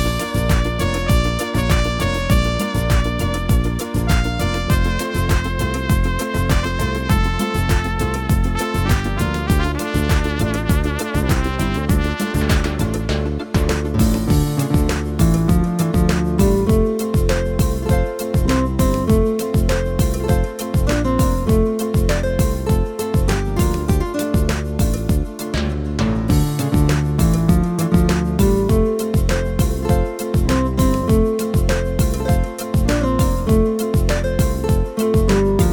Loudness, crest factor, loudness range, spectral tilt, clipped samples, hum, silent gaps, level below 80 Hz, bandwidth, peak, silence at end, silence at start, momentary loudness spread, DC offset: -18 LUFS; 16 dB; 2 LU; -6 dB/octave; under 0.1%; none; none; -22 dBFS; 19 kHz; -2 dBFS; 0 s; 0 s; 4 LU; under 0.1%